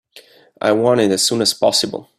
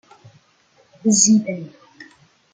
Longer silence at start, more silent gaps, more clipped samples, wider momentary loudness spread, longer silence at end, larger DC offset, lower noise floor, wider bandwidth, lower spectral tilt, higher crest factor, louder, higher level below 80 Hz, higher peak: second, 0.15 s vs 1.05 s; neither; neither; second, 4 LU vs 20 LU; second, 0.15 s vs 0.5 s; neither; second, -46 dBFS vs -58 dBFS; first, 15.5 kHz vs 10 kHz; about the same, -3 dB/octave vs -3.5 dB/octave; about the same, 16 dB vs 20 dB; about the same, -15 LUFS vs -16 LUFS; first, -60 dBFS vs -66 dBFS; about the same, -2 dBFS vs -2 dBFS